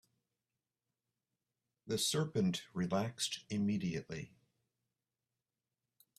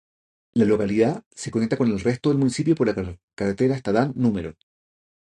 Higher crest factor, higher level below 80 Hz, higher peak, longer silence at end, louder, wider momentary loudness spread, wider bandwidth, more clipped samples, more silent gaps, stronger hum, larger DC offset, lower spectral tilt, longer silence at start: about the same, 20 dB vs 18 dB; second, -74 dBFS vs -50 dBFS; second, -22 dBFS vs -4 dBFS; first, 1.9 s vs 0.8 s; second, -37 LUFS vs -23 LUFS; about the same, 11 LU vs 10 LU; first, 15 kHz vs 11 kHz; neither; second, none vs 1.26-1.31 s, 3.23-3.28 s; neither; neither; second, -4.5 dB/octave vs -7 dB/octave; first, 1.85 s vs 0.55 s